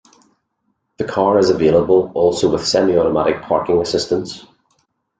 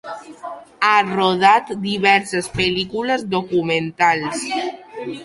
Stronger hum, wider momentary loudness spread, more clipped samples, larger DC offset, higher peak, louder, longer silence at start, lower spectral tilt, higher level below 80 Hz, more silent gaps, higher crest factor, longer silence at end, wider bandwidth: neither; second, 9 LU vs 17 LU; neither; neither; about the same, -2 dBFS vs -2 dBFS; about the same, -16 LUFS vs -18 LUFS; first, 1 s vs 0.05 s; about the same, -5 dB/octave vs -4 dB/octave; about the same, -48 dBFS vs -52 dBFS; neither; about the same, 16 dB vs 18 dB; first, 0.8 s vs 0 s; second, 9.4 kHz vs 11.5 kHz